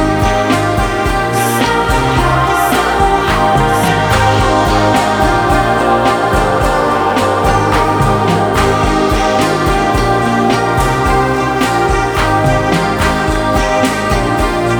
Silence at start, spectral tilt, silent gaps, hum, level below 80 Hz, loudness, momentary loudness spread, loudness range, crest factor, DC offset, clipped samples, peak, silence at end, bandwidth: 0 s; -5 dB/octave; none; none; -22 dBFS; -12 LUFS; 2 LU; 1 LU; 12 dB; under 0.1%; under 0.1%; 0 dBFS; 0 s; over 20 kHz